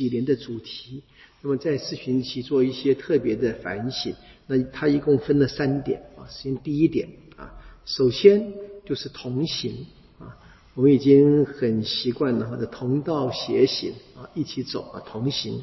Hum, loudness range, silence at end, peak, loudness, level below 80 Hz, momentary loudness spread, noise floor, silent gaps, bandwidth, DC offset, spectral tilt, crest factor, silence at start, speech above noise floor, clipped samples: none; 4 LU; 0 s; -2 dBFS; -23 LUFS; -52 dBFS; 19 LU; -46 dBFS; none; 6 kHz; under 0.1%; -7 dB/octave; 22 dB; 0 s; 23 dB; under 0.1%